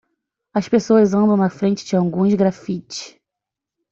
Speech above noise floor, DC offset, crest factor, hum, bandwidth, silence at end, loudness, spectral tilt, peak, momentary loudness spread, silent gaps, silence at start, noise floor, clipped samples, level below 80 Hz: 68 dB; under 0.1%; 16 dB; none; 7.6 kHz; 0.85 s; -18 LUFS; -7 dB/octave; -4 dBFS; 14 LU; none; 0.55 s; -85 dBFS; under 0.1%; -58 dBFS